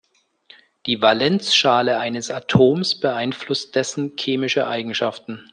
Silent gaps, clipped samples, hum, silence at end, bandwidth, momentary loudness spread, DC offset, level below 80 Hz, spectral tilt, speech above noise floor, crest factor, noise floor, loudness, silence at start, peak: none; under 0.1%; none; 0.1 s; 10 kHz; 9 LU; under 0.1%; -56 dBFS; -4.5 dB/octave; 33 dB; 18 dB; -52 dBFS; -19 LUFS; 0.85 s; -2 dBFS